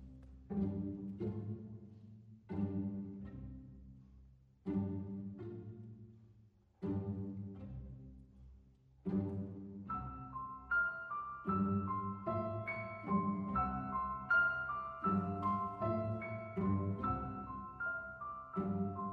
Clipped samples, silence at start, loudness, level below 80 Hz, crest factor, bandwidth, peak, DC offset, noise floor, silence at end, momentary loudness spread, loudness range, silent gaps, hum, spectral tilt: under 0.1%; 0 s; -40 LUFS; -60 dBFS; 18 dB; 4.7 kHz; -24 dBFS; under 0.1%; -67 dBFS; 0 s; 19 LU; 10 LU; none; none; -10 dB/octave